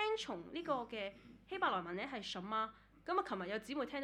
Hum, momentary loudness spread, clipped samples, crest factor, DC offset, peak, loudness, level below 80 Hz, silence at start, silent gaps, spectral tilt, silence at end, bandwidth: none; 9 LU; under 0.1%; 20 dB; under 0.1%; -22 dBFS; -41 LUFS; -72 dBFS; 0 s; none; -4.5 dB/octave; 0 s; 14 kHz